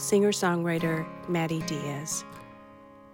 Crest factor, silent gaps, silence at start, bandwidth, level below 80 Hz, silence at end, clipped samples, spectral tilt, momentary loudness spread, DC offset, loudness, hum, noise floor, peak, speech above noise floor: 16 dB; none; 0 s; 17 kHz; -64 dBFS; 0.05 s; under 0.1%; -4.5 dB/octave; 16 LU; under 0.1%; -28 LUFS; none; -50 dBFS; -12 dBFS; 23 dB